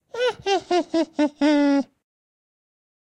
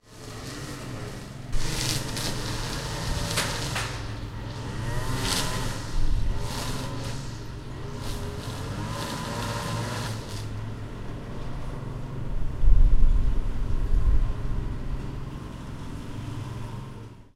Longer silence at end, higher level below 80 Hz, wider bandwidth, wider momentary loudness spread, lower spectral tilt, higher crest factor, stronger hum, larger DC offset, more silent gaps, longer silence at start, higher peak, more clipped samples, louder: first, 1.2 s vs 0.1 s; second, -64 dBFS vs -28 dBFS; second, 9 kHz vs 14.5 kHz; second, 6 LU vs 11 LU; about the same, -3.5 dB/octave vs -4.5 dB/octave; second, 12 dB vs 20 dB; neither; neither; neither; about the same, 0.15 s vs 0.1 s; second, -10 dBFS vs -4 dBFS; neither; first, -22 LUFS vs -31 LUFS